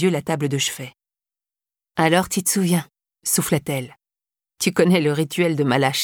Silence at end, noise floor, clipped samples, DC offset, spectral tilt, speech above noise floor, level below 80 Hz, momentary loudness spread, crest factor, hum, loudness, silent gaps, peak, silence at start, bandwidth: 0 s; under -90 dBFS; under 0.1%; under 0.1%; -4.5 dB/octave; over 70 dB; -58 dBFS; 11 LU; 18 dB; none; -20 LUFS; none; -4 dBFS; 0 s; 19 kHz